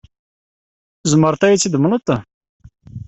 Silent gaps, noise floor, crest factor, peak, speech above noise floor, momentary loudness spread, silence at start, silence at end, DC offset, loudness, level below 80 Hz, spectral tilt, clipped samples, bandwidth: 2.34-2.41 s, 2.49-2.60 s; under -90 dBFS; 16 dB; -2 dBFS; over 76 dB; 9 LU; 1.05 s; 0.05 s; under 0.1%; -16 LUFS; -52 dBFS; -5 dB/octave; under 0.1%; 8.4 kHz